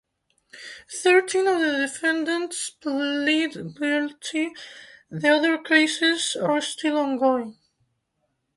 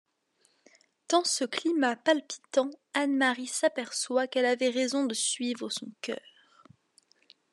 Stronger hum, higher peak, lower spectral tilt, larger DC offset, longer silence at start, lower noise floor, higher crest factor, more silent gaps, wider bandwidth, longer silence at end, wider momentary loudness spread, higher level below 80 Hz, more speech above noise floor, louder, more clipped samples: neither; first, -4 dBFS vs -10 dBFS; first, -3 dB/octave vs -1.5 dB/octave; neither; second, 0.55 s vs 1.1 s; first, -75 dBFS vs -71 dBFS; about the same, 20 dB vs 20 dB; neither; about the same, 11.5 kHz vs 12.5 kHz; second, 1.05 s vs 1.35 s; first, 16 LU vs 9 LU; first, -72 dBFS vs under -90 dBFS; first, 52 dB vs 42 dB; first, -23 LUFS vs -29 LUFS; neither